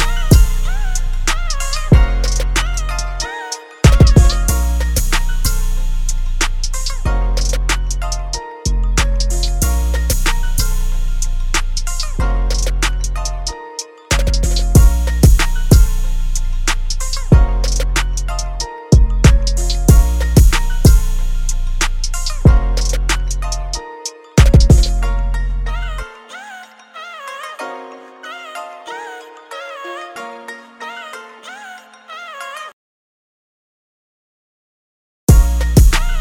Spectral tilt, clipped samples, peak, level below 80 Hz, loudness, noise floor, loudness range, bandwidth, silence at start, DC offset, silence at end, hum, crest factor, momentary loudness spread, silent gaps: -4.5 dB/octave; under 0.1%; 0 dBFS; -16 dBFS; -16 LUFS; -36 dBFS; 15 LU; 16.5 kHz; 0 s; under 0.1%; 0 s; none; 14 dB; 18 LU; 32.73-35.27 s